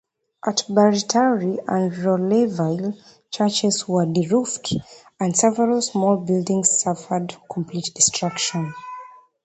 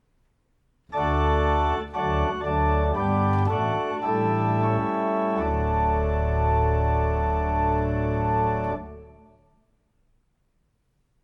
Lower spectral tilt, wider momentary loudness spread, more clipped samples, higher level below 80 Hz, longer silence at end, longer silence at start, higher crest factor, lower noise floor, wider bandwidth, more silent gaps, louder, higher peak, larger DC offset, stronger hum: second, -4 dB/octave vs -9 dB/octave; first, 12 LU vs 4 LU; neither; second, -60 dBFS vs -32 dBFS; second, 0.35 s vs 2.15 s; second, 0.45 s vs 0.9 s; about the same, 18 dB vs 14 dB; second, -41 dBFS vs -69 dBFS; first, 9 kHz vs 6.2 kHz; neither; first, -20 LUFS vs -24 LUFS; first, -2 dBFS vs -12 dBFS; neither; neither